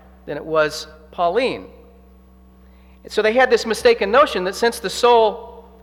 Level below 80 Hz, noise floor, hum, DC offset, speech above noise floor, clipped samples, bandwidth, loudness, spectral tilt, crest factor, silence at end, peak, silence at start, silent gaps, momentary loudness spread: -48 dBFS; -47 dBFS; none; under 0.1%; 30 dB; under 0.1%; 16.5 kHz; -17 LUFS; -3.5 dB/octave; 16 dB; 0.2 s; -2 dBFS; 0.25 s; none; 17 LU